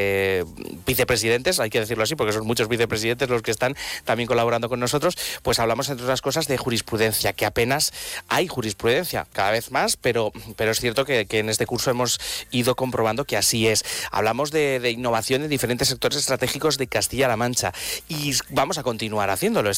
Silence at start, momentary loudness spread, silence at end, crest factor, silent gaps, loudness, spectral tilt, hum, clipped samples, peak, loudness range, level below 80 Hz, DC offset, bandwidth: 0 s; 5 LU; 0 s; 12 dB; none; -22 LUFS; -3.5 dB/octave; none; under 0.1%; -10 dBFS; 1 LU; -48 dBFS; under 0.1%; 18 kHz